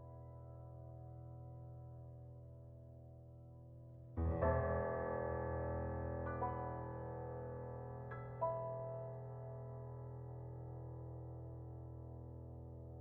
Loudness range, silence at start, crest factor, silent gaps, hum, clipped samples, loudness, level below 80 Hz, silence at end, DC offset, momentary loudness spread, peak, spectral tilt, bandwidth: 14 LU; 0 s; 22 dB; none; none; under 0.1%; -46 LUFS; -56 dBFS; 0 s; under 0.1%; 17 LU; -24 dBFS; -10 dB/octave; 2.9 kHz